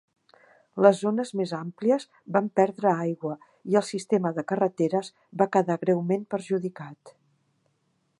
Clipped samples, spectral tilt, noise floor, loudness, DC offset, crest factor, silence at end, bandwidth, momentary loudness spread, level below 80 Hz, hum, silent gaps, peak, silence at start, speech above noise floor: under 0.1%; -7 dB/octave; -72 dBFS; -26 LUFS; under 0.1%; 24 dB; 1.1 s; 11.5 kHz; 13 LU; -78 dBFS; none; none; -4 dBFS; 0.75 s; 47 dB